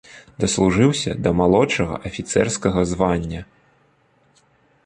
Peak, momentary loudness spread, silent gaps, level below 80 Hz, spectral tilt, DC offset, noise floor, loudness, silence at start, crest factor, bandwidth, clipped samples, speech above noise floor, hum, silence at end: -2 dBFS; 9 LU; none; -40 dBFS; -5 dB/octave; under 0.1%; -60 dBFS; -19 LUFS; 0.1 s; 18 dB; 10.5 kHz; under 0.1%; 41 dB; none; 1.4 s